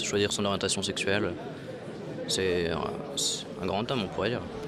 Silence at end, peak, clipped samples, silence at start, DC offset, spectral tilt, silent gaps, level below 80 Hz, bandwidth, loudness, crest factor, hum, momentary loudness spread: 0 s; -12 dBFS; under 0.1%; 0 s; under 0.1%; -3.5 dB/octave; none; -56 dBFS; 14.5 kHz; -30 LUFS; 18 dB; none; 12 LU